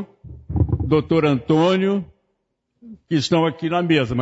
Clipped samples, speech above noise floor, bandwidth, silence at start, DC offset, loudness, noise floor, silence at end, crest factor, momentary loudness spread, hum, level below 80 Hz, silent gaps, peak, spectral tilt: under 0.1%; 55 dB; 8 kHz; 0 s; under 0.1%; -19 LUFS; -73 dBFS; 0 s; 16 dB; 9 LU; none; -38 dBFS; none; -4 dBFS; -7 dB/octave